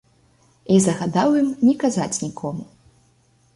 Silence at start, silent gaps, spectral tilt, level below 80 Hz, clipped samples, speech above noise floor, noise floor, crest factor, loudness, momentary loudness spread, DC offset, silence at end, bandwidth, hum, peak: 0.7 s; none; -5.5 dB/octave; -58 dBFS; under 0.1%; 40 dB; -59 dBFS; 18 dB; -20 LUFS; 12 LU; under 0.1%; 0.9 s; 11.5 kHz; none; -4 dBFS